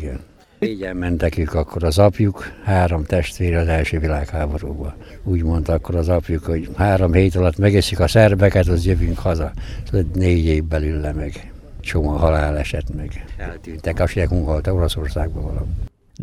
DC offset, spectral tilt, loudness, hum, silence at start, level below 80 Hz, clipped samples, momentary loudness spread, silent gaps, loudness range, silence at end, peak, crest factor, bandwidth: under 0.1%; -7 dB/octave; -19 LUFS; none; 0 s; -26 dBFS; under 0.1%; 15 LU; none; 6 LU; 0 s; -2 dBFS; 18 dB; 13.5 kHz